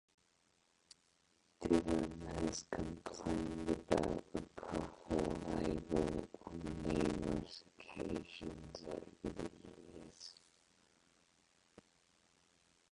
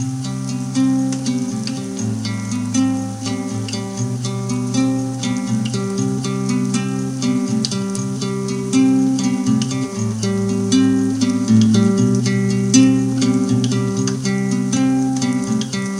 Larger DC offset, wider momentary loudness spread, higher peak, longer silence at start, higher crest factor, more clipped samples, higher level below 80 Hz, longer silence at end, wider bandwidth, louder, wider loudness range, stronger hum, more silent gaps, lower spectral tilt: neither; first, 16 LU vs 9 LU; second, -18 dBFS vs 0 dBFS; first, 1.6 s vs 0 s; first, 26 dB vs 18 dB; neither; about the same, -56 dBFS vs -52 dBFS; first, 2.6 s vs 0 s; about the same, 11.5 kHz vs 12 kHz; second, -41 LUFS vs -18 LUFS; first, 13 LU vs 6 LU; neither; neither; about the same, -6 dB/octave vs -5.5 dB/octave